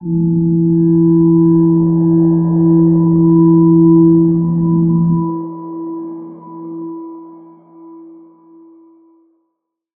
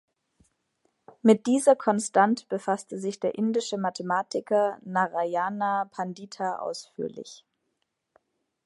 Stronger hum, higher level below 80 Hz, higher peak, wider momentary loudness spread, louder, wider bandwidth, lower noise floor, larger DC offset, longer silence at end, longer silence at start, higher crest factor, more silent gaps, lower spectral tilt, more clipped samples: neither; first, -46 dBFS vs -78 dBFS; first, -2 dBFS vs -6 dBFS; first, 19 LU vs 13 LU; first, -11 LUFS vs -26 LUFS; second, 1.6 kHz vs 11.5 kHz; second, -73 dBFS vs -78 dBFS; neither; first, 1.95 s vs 1.3 s; second, 0 s vs 1.25 s; second, 12 dB vs 22 dB; neither; first, -16.5 dB/octave vs -5 dB/octave; neither